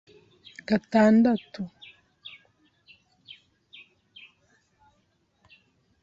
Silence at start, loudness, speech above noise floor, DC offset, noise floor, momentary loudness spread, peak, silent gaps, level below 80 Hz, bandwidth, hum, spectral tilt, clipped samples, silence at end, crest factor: 0.7 s; -23 LUFS; 48 dB; under 0.1%; -70 dBFS; 29 LU; -8 dBFS; none; -68 dBFS; 7.6 kHz; none; -7 dB/octave; under 0.1%; 4.35 s; 20 dB